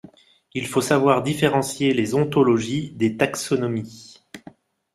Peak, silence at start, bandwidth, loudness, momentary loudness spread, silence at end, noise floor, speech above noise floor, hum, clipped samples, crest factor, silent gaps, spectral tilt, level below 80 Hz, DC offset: -4 dBFS; 0.55 s; 15.5 kHz; -21 LUFS; 13 LU; 0.55 s; -49 dBFS; 28 dB; none; under 0.1%; 18 dB; none; -5.5 dB/octave; -58 dBFS; under 0.1%